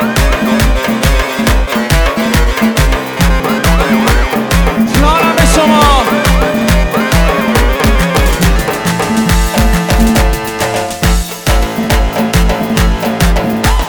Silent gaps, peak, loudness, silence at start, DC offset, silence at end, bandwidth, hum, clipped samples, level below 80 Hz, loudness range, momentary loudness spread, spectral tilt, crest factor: none; 0 dBFS; -11 LUFS; 0 s; under 0.1%; 0 s; over 20 kHz; none; under 0.1%; -14 dBFS; 3 LU; 5 LU; -5 dB/octave; 10 dB